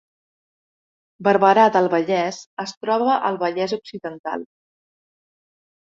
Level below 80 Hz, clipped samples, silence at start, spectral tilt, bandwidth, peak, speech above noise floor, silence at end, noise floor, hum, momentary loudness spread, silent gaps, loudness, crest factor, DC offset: -70 dBFS; under 0.1%; 1.2 s; -5.5 dB/octave; 7.8 kHz; -2 dBFS; over 71 dB; 1.4 s; under -90 dBFS; none; 16 LU; 2.46-2.57 s, 2.77-2.81 s, 4.19-4.24 s; -19 LUFS; 20 dB; under 0.1%